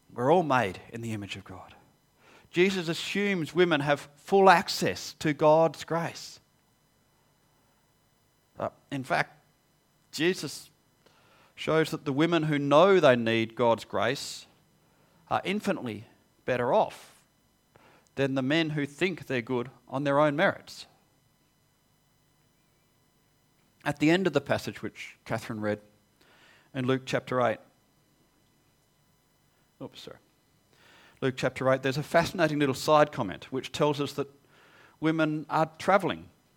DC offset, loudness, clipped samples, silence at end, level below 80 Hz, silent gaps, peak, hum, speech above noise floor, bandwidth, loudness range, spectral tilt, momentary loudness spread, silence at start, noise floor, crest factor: under 0.1%; -27 LUFS; under 0.1%; 0.35 s; -66 dBFS; none; -4 dBFS; none; 41 dB; 18 kHz; 10 LU; -5.5 dB/octave; 17 LU; 0.1 s; -68 dBFS; 24 dB